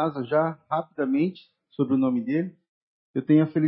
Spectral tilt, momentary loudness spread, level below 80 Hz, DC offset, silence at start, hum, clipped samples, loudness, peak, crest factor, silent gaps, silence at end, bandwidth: -12.5 dB/octave; 11 LU; -72 dBFS; under 0.1%; 0 s; none; under 0.1%; -25 LUFS; -8 dBFS; 16 dB; 2.69-3.14 s; 0 s; 5.2 kHz